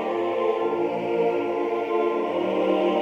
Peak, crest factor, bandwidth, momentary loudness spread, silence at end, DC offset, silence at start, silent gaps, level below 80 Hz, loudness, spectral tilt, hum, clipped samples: -10 dBFS; 12 dB; 7.2 kHz; 3 LU; 0 s; under 0.1%; 0 s; none; -68 dBFS; -24 LUFS; -7 dB/octave; none; under 0.1%